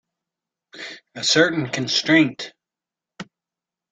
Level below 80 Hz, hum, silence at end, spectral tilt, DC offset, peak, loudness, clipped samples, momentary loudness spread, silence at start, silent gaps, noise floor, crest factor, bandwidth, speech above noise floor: -66 dBFS; none; 0.7 s; -3.5 dB/octave; under 0.1%; -2 dBFS; -18 LUFS; under 0.1%; 24 LU; 0.75 s; none; -88 dBFS; 22 dB; 9.4 kHz; 69 dB